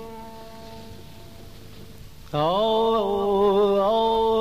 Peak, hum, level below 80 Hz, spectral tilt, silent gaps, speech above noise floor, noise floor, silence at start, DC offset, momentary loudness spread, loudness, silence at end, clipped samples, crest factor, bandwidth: -10 dBFS; none; -48 dBFS; -6.5 dB/octave; none; 23 dB; -44 dBFS; 0 s; 0.6%; 22 LU; -21 LUFS; 0 s; under 0.1%; 14 dB; 15.5 kHz